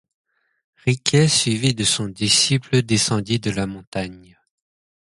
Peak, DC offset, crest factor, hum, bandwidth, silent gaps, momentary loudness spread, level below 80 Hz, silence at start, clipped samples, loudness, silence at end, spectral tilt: -4 dBFS; under 0.1%; 18 dB; none; 11.5 kHz; 3.87-3.92 s; 12 LU; -50 dBFS; 0.85 s; under 0.1%; -19 LUFS; 0.85 s; -3.5 dB/octave